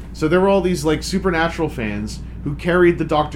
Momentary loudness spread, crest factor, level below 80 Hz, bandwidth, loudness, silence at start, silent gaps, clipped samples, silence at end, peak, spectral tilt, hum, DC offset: 12 LU; 14 dB; -32 dBFS; 14.5 kHz; -18 LUFS; 0 s; none; under 0.1%; 0 s; -4 dBFS; -6 dB/octave; none; under 0.1%